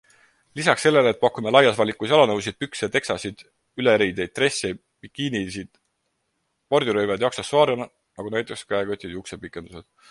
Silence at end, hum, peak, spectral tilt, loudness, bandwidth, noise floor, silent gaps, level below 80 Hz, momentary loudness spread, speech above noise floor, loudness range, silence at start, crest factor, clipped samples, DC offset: 0.3 s; none; 0 dBFS; -4 dB/octave; -22 LUFS; 11.5 kHz; -74 dBFS; none; -56 dBFS; 18 LU; 52 dB; 5 LU; 0.55 s; 22 dB; under 0.1%; under 0.1%